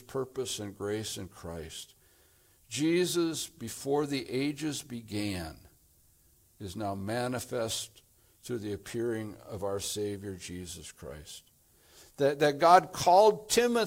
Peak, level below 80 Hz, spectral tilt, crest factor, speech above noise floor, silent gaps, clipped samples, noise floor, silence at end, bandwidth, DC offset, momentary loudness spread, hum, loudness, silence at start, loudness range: -6 dBFS; -64 dBFS; -4 dB/octave; 26 dB; 34 dB; none; under 0.1%; -64 dBFS; 0 s; 16.5 kHz; under 0.1%; 21 LU; none; -30 LUFS; 0.1 s; 10 LU